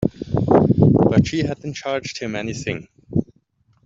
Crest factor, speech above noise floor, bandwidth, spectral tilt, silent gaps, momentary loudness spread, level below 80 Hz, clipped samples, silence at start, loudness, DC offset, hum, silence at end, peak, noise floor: 16 dB; 36 dB; 7.8 kHz; -7 dB/octave; none; 13 LU; -42 dBFS; under 0.1%; 0 s; -19 LUFS; under 0.1%; none; 0.6 s; -2 dBFS; -61 dBFS